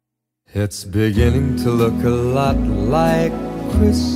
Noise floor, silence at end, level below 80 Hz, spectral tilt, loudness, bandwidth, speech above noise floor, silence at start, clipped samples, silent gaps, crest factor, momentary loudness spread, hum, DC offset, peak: -63 dBFS; 0 s; -26 dBFS; -7 dB/octave; -18 LUFS; 16 kHz; 47 dB; 0.55 s; under 0.1%; none; 14 dB; 8 LU; none; under 0.1%; -4 dBFS